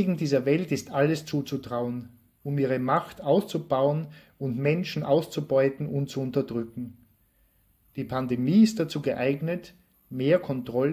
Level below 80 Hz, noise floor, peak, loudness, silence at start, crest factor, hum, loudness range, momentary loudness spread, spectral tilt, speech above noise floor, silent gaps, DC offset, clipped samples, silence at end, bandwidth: -62 dBFS; -65 dBFS; -8 dBFS; -27 LUFS; 0 s; 18 dB; none; 3 LU; 12 LU; -7 dB/octave; 39 dB; none; under 0.1%; under 0.1%; 0 s; 16 kHz